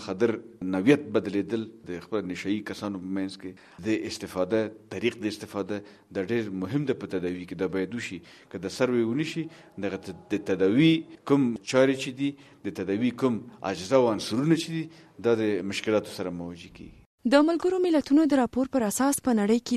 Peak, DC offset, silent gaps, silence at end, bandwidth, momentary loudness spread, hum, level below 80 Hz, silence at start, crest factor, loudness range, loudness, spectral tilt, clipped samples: -6 dBFS; under 0.1%; 17.06-17.18 s; 0 s; 13.5 kHz; 14 LU; none; -64 dBFS; 0 s; 22 dB; 6 LU; -27 LUFS; -5.5 dB/octave; under 0.1%